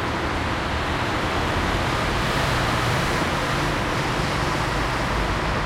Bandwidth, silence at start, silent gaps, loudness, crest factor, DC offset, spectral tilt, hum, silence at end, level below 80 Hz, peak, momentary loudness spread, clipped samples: 16.5 kHz; 0 s; none; -23 LUFS; 14 dB; under 0.1%; -4.5 dB/octave; none; 0 s; -32 dBFS; -10 dBFS; 3 LU; under 0.1%